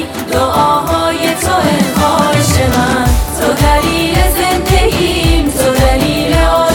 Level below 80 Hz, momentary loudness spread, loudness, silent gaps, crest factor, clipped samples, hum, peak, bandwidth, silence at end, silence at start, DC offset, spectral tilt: -18 dBFS; 3 LU; -11 LUFS; none; 10 dB; under 0.1%; none; 0 dBFS; 19 kHz; 0 s; 0 s; under 0.1%; -4.5 dB/octave